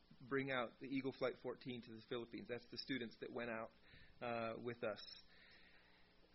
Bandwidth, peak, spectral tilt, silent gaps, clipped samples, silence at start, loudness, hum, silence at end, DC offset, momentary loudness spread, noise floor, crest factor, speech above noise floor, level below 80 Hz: 5.8 kHz; -28 dBFS; -3.5 dB/octave; none; under 0.1%; 0.05 s; -48 LUFS; none; 0.1 s; under 0.1%; 21 LU; -70 dBFS; 20 dB; 23 dB; -76 dBFS